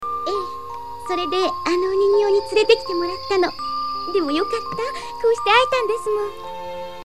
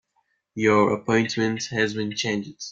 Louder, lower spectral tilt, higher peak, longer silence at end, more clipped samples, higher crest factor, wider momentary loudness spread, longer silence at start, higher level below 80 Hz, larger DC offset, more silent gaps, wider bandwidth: first, -20 LUFS vs -23 LUFS; about the same, -3.5 dB/octave vs -4.5 dB/octave; first, 0 dBFS vs -6 dBFS; about the same, 0 s vs 0 s; neither; about the same, 20 dB vs 18 dB; first, 15 LU vs 8 LU; second, 0 s vs 0.55 s; first, -52 dBFS vs -60 dBFS; first, 1% vs under 0.1%; neither; first, 13.5 kHz vs 7.8 kHz